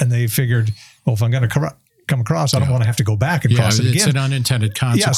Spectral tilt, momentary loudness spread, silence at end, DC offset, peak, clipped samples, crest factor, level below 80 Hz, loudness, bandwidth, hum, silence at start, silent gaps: -5 dB/octave; 7 LU; 0 s; under 0.1%; 0 dBFS; under 0.1%; 16 dB; -50 dBFS; -17 LUFS; 15.5 kHz; none; 0 s; none